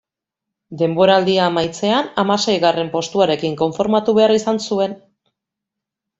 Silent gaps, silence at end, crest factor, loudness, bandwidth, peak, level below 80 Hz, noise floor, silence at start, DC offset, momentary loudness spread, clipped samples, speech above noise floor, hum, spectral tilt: none; 1.25 s; 16 dB; -17 LUFS; 8 kHz; -2 dBFS; -60 dBFS; -83 dBFS; 0.7 s; under 0.1%; 7 LU; under 0.1%; 67 dB; none; -5 dB/octave